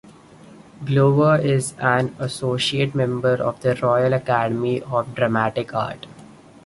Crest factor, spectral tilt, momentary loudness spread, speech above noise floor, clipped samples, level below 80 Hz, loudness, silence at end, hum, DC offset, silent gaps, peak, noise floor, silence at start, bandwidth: 18 dB; -6 dB/octave; 9 LU; 25 dB; under 0.1%; -56 dBFS; -20 LUFS; 0.35 s; none; under 0.1%; none; -2 dBFS; -45 dBFS; 0.05 s; 11.5 kHz